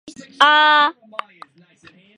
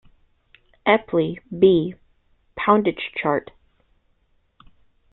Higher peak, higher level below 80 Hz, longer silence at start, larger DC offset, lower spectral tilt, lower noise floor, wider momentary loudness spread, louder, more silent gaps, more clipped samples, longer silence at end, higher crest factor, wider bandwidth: about the same, 0 dBFS vs -2 dBFS; second, -72 dBFS vs -58 dBFS; second, 0.05 s vs 0.85 s; neither; second, -1 dB/octave vs -10.5 dB/octave; second, -50 dBFS vs -64 dBFS; first, 21 LU vs 10 LU; first, -14 LUFS vs -21 LUFS; neither; neither; second, 1.25 s vs 1.75 s; about the same, 18 dB vs 22 dB; first, 10.5 kHz vs 4.1 kHz